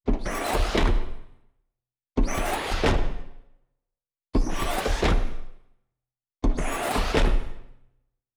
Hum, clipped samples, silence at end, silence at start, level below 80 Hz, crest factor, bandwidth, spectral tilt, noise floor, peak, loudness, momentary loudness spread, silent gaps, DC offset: none; under 0.1%; 0.65 s; 0.05 s; -28 dBFS; 16 dB; over 20 kHz; -5 dB/octave; -89 dBFS; -10 dBFS; -27 LUFS; 13 LU; none; under 0.1%